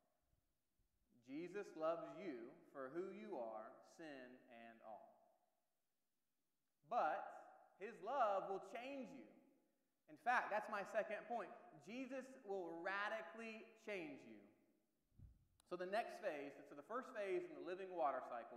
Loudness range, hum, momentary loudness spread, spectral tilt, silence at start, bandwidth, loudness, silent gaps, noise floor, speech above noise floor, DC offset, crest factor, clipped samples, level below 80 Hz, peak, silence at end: 9 LU; none; 18 LU; -5 dB/octave; 1.25 s; 14 kHz; -48 LUFS; none; under -90 dBFS; over 42 dB; under 0.1%; 24 dB; under 0.1%; -88 dBFS; -26 dBFS; 0 s